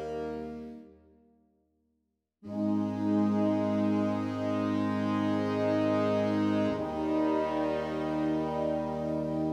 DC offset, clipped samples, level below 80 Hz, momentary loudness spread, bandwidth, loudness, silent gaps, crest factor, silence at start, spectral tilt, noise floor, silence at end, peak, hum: under 0.1%; under 0.1%; -58 dBFS; 9 LU; 8.8 kHz; -30 LUFS; none; 12 dB; 0 s; -8 dB/octave; -80 dBFS; 0 s; -18 dBFS; none